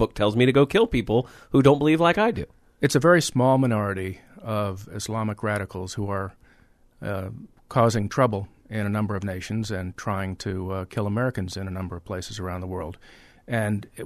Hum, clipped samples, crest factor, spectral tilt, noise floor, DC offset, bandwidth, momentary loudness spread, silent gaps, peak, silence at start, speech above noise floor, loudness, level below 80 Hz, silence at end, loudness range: none; under 0.1%; 20 dB; -6 dB/octave; -57 dBFS; under 0.1%; 13.5 kHz; 15 LU; none; -4 dBFS; 0 s; 33 dB; -24 LUFS; -48 dBFS; 0 s; 10 LU